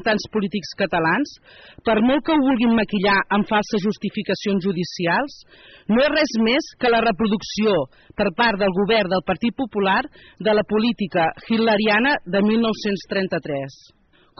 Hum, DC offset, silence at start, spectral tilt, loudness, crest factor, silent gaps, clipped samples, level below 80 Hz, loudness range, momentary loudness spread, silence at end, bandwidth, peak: none; under 0.1%; 0 s; -3.5 dB/octave; -20 LUFS; 12 dB; none; under 0.1%; -50 dBFS; 2 LU; 7 LU; 0.7 s; 6.4 kHz; -8 dBFS